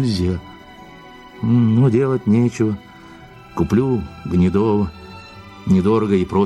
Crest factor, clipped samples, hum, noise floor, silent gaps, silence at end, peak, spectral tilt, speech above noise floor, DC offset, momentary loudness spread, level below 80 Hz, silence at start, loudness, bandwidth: 14 dB; under 0.1%; none; -41 dBFS; none; 0 s; -4 dBFS; -8.5 dB/octave; 24 dB; under 0.1%; 16 LU; -42 dBFS; 0 s; -18 LUFS; 11 kHz